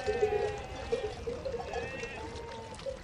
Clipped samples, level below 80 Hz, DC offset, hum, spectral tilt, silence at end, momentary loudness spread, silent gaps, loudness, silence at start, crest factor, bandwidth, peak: under 0.1%; -50 dBFS; under 0.1%; none; -5 dB/octave; 0 s; 11 LU; none; -36 LUFS; 0 s; 18 dB; 11 kHz; -18 dBFS